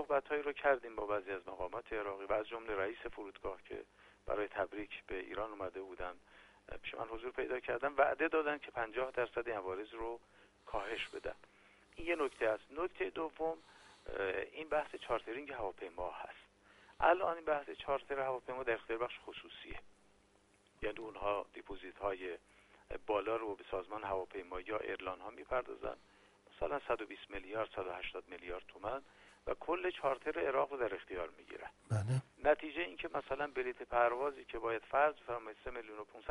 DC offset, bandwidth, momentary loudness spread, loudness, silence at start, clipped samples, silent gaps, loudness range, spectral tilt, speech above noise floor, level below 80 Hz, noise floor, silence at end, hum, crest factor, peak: under 0.1%; 11.5 kHz; 14 LU; -40 LUFS; 0 s; under 0.1%; none; 6 LU; -6.5 dB/octave; 31 dB; -62 dBFS; -70 dBFS; 0 s; none; 24 dB; -18 dBFS